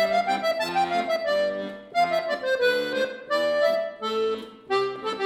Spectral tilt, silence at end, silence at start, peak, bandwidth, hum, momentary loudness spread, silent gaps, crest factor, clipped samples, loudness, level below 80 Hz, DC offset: -3.5 dB/octave; 0 s; 0 s; -12 dBFS; 17.5 kHz; none; 6 LU; none; 12 dB; under 0.1%; -25 LUFS; -66 dBFS; under 0.1%